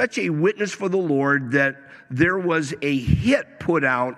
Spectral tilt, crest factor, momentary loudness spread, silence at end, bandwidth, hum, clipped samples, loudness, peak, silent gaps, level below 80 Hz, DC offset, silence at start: -6 dB/octave; 16 dB; 5 LU; 0 s; 12.5 kHz; none; under 0.1%; -21 LUFS; -6 dBFS; none; -42 dBFS; under 0.1%; 0 s